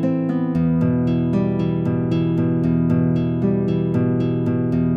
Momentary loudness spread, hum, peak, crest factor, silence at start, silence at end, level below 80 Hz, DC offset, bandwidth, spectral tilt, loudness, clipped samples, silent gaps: 2 LU; none; -8 dBFS; 10 dB; 0 s; 0 s; -42 dBFS; under 0.1%; 4.9 kHz; -10.5 dB/octave; -20 LUFS; under 0.1%; none